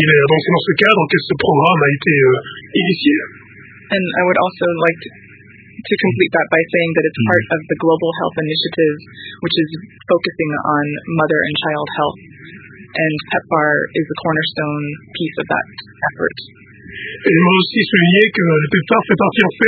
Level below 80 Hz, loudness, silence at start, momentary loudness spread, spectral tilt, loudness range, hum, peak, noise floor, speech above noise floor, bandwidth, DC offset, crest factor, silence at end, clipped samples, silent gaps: -52 dBFS; -15 LUFS; 0 s; 11 LU; -8.5 dB/octave; 5 LU; none; 0 dBFS; -41 dBFS; 26 dB; 4.8 kHz; under 0.1%; 16 dB; 0 s; under 0.1%; none